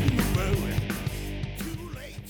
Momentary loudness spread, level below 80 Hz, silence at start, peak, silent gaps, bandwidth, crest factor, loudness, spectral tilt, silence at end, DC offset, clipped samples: 10 LU; -36 dBFS; 0 s; -12 dBFS; none; over 20 kHz; 16 dB; -30 LUFS; -5.5 dB/octave; 0 s; under 0.1%; under 0.1%